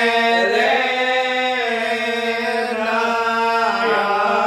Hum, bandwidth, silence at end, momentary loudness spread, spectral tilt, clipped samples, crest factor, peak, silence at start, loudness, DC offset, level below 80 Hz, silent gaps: none; 15.5 kHz; 0 s; 4 LU; -3 dB/octave; under 0.1%; 14 dB; -4 dBFS; 0 s; -18 LUFS; under 0.1%; -64 dBFS; none